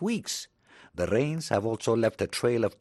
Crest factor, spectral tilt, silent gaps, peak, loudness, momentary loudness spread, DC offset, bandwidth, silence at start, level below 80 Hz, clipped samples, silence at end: 18 dB; -5 dB/octave; none; -10 dBFS; -28 LUFS; 9 LU; under 0.1%; 12.5 kHz; 0 s; -58 dBFS; under 0.1%; 0.05 s